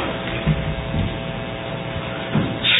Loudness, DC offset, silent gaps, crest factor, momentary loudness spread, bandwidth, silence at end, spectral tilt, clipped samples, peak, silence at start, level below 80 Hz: -24 LUFS; under 0.1%; none; 18 dB; 6 LU; 4 kHz; 0 s; -10.5 dB/octave; under 0.1%; -4 dBFS; 0 s; -34 dBFS